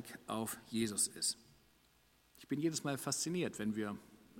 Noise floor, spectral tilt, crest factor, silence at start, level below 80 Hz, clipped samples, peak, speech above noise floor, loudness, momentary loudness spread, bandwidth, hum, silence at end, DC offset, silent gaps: -71 dBFS; -3.5 dB/octave; 20 dB; 0 s; -74 dBFS; under 0.1%; -20 dBFS; 32 dB; -38 LUFS; 9 LU; 16.5 kHz; none; 0 s; under 0.1%; none